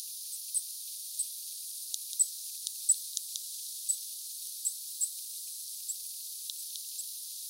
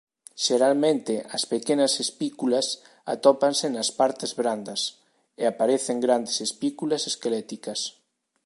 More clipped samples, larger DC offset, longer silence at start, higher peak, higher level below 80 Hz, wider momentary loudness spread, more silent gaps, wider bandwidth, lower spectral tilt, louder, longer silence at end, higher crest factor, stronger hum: neither; neither; second, 0 s vs 0.35 s; second, -12 dBFS vs -4 dBFS; second, under -90 dBFS vs -80 dBFS; about the same, 9 LU vs 10 LU; neither; first, 16.5 kHz vs 11.5 kHz; second, 11 dB/octave vs -3 dB/octave; second, -34 LUFS vs -25 LUFS; second, 0 s vs 0.55 s; first, 26 dB vs 20 dB; neither